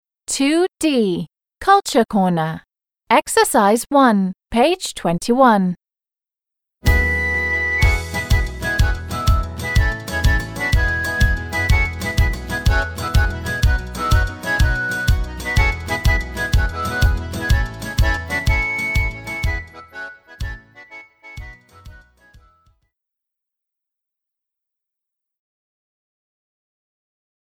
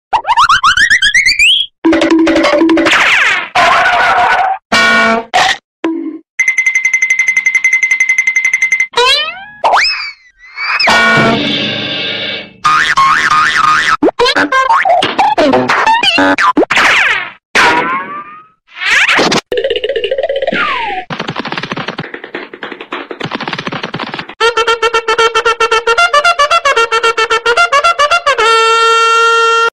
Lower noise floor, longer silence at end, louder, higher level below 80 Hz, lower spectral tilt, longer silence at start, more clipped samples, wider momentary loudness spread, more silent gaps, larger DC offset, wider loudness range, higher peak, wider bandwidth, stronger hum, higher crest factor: first, under -90 dBFS vs -35 dBFS; first, 5.45 s vs 0.05 s; second, -18 LUFS vs -9 LUFS; first, -24 dBFS vs -44 dBFS; first, -5 dB/octave vs -2.5 dB/octave; first, 0.3 s vs 0.1 s; neither; first, 16 LU vs 12 LU; second, none vs 1.78-1.82 s, 4.65-4.70 s, 5.64-5.83 s, 6.29-6.38 s, 17.45-17.54 s; neither; about the same, 7 LU vs 8 LU; about the same, -2 dBFS vs 0 dBFS; first, 18.5 kHz vs 15.5 kHz; neither; first, 18 dB vs 10 dB